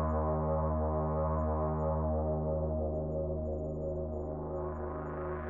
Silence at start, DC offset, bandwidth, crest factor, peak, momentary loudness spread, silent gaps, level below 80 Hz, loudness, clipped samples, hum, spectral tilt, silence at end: 0 s; under 0.1%; 2.5 kHz; 12 dB; -22 dBFS; 6 LU; none; -42 dBFS; -34 LUFS; under 0.1%; none; -12 dB/octave; 0 s